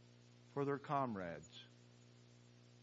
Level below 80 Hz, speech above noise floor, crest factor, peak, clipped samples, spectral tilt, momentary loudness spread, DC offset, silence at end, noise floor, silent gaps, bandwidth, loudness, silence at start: -84 dBFS; 22 dB; 20 dB; -26 dBFS; under 0.1%; -5.5 dB/octave; 25 LU; under 0.1%; 0 s; -65 dBFS; none; 7.6 kHz; -43 LUFS; 0 s